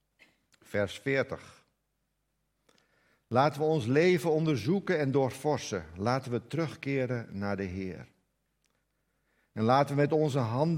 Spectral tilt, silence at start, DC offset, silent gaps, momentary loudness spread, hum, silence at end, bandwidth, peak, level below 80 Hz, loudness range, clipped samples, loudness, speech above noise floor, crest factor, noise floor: -6.5 dB/octave; 0.7 s; under 0.1%; none; 11 LU; none; 0 s; 16 kHz; -10 dBFS; -70 dBFS; 8 LU; under 0.1%; -30 LUFS; 50 dB; 20 dB; -79 dBFS